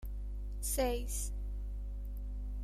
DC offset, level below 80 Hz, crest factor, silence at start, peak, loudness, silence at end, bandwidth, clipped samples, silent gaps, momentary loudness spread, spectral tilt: under 0.1%; -40 dBFS; 18 dB; 0 s; -20 dBFS; -39 LUFS; 0 s; 15.5 kHz; under 0.1%; none; 10 LU; -4.5 dB/octave